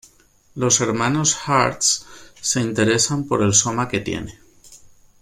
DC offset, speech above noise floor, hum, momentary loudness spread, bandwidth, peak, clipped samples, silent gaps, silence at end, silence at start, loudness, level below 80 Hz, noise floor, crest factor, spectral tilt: under 0.1%; 35 dB; none; 11 LU; 16 kHz; 0 dBFS; under 0.1%; none; 0.35 s; 0.55 s; -19 LUFS; -50 dBFS; -55 dBFS; 20 dB; -3 dB/octave